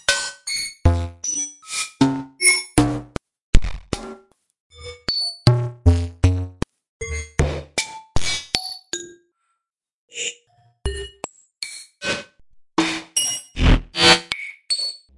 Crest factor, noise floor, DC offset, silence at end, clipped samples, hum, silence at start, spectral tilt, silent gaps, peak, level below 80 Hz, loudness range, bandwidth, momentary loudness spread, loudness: 22 dB; -79 dBFS; under 0.1%; 0.2 s; under 0.1%; none; 0.1 s; -3.5 dB/octave; 3.41-3.53 s, 4.60-4.70 s, 6.89-7.00 s, 9.93-10.08 s; 0 dBFS; -30 dBFS; 10 LU; 11.5 kHz; 16 LU; -21 LUFS